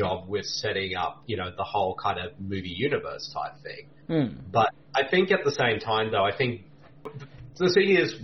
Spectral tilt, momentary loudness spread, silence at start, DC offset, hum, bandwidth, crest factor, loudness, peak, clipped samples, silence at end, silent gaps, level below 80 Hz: -5 dB/octave; 19 LU; 0 s; 0.2%; none; 6.4 kHz; 18 dB; -26 LUFS; -10 dBFS; under 0.1%; 0 s; none; -58 dBFS